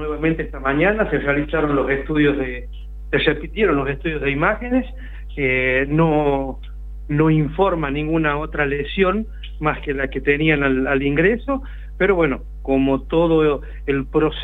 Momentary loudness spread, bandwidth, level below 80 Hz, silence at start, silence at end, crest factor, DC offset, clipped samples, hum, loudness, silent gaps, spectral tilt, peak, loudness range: 10 LU; 4.2 kHz; -32 dBFS; 0 s; 0 s; 16 dB; under 0.1%; under 0.1%; none; -19 LUFS; none; -9 dB/octave; -2 dBFS; 2 LU